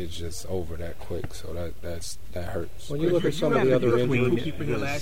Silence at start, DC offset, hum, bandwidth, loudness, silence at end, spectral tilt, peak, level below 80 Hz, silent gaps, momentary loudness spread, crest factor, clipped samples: 0 s; 3%; none; 16 kHz; -27 LUFS; 0 s; -6 dB/octave; -10 dBFS; -44 dBFS; none; 14 LU; 16 dB; under 0.1%